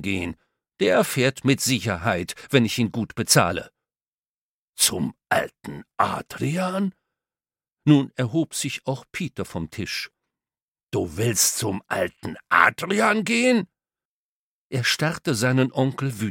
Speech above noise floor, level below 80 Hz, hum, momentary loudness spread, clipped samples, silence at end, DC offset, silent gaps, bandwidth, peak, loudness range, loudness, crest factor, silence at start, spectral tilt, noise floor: over 67 dB; -56 dBFS; none; 12 LU; under 0.1%; 0 s; under 0.1%; 4.07-4.73 s, 10.62-10.74 s, 10.83-10.87 s, 14.05-14.70 s; 17 kHz; 0 dBFS; 5 LU; -23 LUFS; 24 dB; 0 s; -4 dB/octave; under -90 dBFS